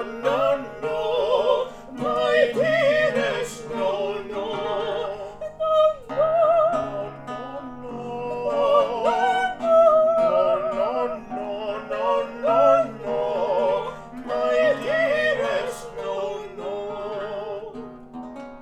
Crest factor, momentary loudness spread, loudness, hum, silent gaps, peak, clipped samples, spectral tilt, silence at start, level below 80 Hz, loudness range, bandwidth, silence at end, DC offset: 18 dB; 15 LU; -22 LUFS; none; none; -6 dBFS; under 0.1%; -4.5 dB/octave; 0 s; -54 dBFS; 4 LU; 12.5 kHz; 0 s; under 0.1%